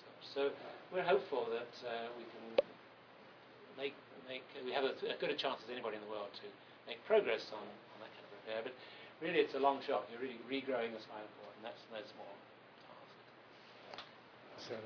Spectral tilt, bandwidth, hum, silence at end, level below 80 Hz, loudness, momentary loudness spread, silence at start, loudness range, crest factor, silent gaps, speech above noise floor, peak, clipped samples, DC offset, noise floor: -1.5 dB/octave; 5.4 kHz; none; 0 s; -88 dBFS; -40 LUFS; 23 LU; 0 s; 8 LU; 24 dB; none; 20 dB; -18 dBFS; under 0.1%; under 0.1%; -60 dBFS